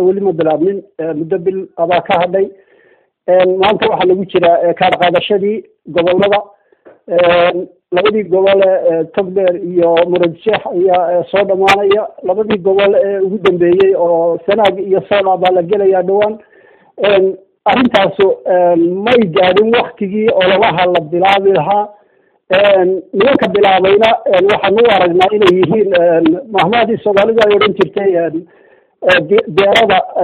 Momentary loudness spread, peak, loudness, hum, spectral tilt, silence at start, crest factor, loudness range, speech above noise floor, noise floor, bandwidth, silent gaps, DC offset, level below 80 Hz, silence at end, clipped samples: 7 LU; 0 dBFS; -11 LUFS; none; -6.5 dB/octave; 0 s; 12 dB; 3 LU; 42 dB; -53 dBFS; 8.4 kHz; none; under 0.1%; -50 dBFS; 0 s; under 0.1%